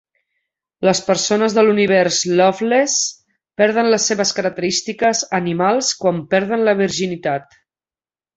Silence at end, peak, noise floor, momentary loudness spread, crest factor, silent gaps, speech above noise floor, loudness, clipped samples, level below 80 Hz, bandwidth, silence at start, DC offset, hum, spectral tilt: 0.95 s; -2 dBFS; under -90 dBFS; 6 LU; 16 dB; none; over 74 dB; -16 LUFS; under 0.1%; -60 dBFS; 8.2 kHz; 0.8 s; under 0.1%; none; -3.5 dB/octave